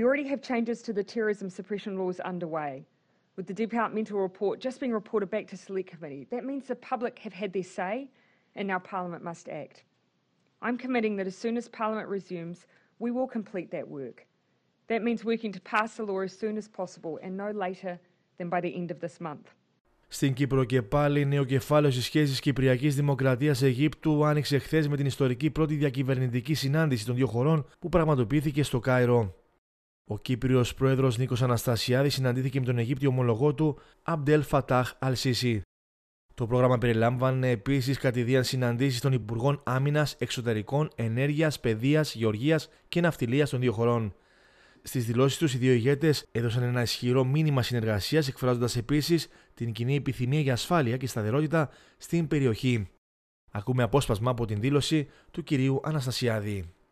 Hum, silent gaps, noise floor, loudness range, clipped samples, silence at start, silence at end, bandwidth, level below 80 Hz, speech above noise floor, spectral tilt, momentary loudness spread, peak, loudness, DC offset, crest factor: none; 19.81-19.85 s, 29.58-30.05 s, 35.65-36.29 s, 52.98-53.48 s; -72 dBFS; 8 LU; under 0.1%; 0 s; 0.2 s; 14.5 kHz; -54 dBFS; 45 dB; -6.5 dB/octave; 12 LU; -10 dBFS; -28 LUFS; under 0.1%; 18 dB